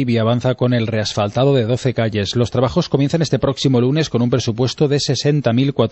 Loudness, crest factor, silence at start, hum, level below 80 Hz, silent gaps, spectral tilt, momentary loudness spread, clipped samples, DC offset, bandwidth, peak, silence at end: -17 LUFS; 14 dB; 0 s; none; -44 dBFS; none; -6 dB/octave; 3 LU; under 0.1%; under 0.1%; 8.4 kHz; -2 dBFS; 0 s